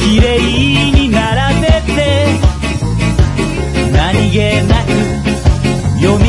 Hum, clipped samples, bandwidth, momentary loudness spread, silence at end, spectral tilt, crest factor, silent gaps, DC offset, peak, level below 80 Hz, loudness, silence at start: none; under 0.1%; 11.5 kHz; 4 LU; 0 s; -6 dB/octave; 10 dB; none; under 0.1%; 0 dBFS; -18 dBFS; -12 LUFS; 0 s